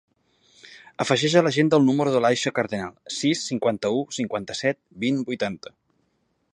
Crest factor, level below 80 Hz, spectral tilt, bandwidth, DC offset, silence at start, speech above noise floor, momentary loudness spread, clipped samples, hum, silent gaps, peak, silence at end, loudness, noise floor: 22 dB; -64 dBFS; -5 dB/octave; 11 kHz; under 0.1%; 0.65 s; 48 dB; 11 LU; under 0.1%; none; none; -2 dBFS; 0.95 s; -23 LUFS; -70 dBFS